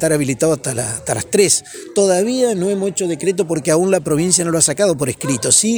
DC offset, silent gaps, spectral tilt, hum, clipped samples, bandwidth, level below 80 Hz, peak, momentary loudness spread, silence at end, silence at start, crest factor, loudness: under 0.1%; none; -3.5 dB/octave; none; under 0.1%; over 20 kHz; -50 dBFS; 0 dBFS; 7 LU; 0 s; 0 s; 16 dB; -16 LUFS